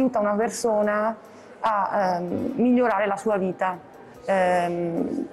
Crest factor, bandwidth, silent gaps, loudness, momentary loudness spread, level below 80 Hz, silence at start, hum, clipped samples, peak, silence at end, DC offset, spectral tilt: 10 dB; 12.5 kHz; none; -24 LUFS; 8 LU; -62 dBFS; 0 s; none; under 0.1%; -12 dBFS; 0 s; under 0.1%; -6 dB/octave